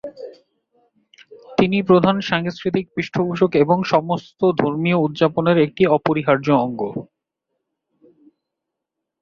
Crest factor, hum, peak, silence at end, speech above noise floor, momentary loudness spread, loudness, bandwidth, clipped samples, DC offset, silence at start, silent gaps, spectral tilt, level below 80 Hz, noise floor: 18 dB; none; -2 dBFS; 2.15 s; 64 dB; 11 LU; -18 LUFS; 7 kHz; under 0.1%; under 0.1%; 0.05 s; none; -7.5 dB/octave; -58 dBFS; -82 dBFS